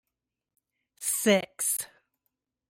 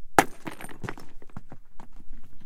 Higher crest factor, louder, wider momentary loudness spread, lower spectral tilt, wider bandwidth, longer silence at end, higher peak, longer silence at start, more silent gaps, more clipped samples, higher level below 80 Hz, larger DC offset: second, 22 dB vs 28 dB; first, -27 LUFS vs -30 LUFS; second, 10 LU vs 29 LU; about the same, -2.5 dB/octave vs -3.5 dB/octave; about the same, 16.5 kHz vs 17 kHz; first, 0.85 s vs 0 s; second, -10 dBFS vs 0 dBFS; first, 1 s vs 0 s; neither; neither; second, -78 dBFS vs -44 dBFS; neither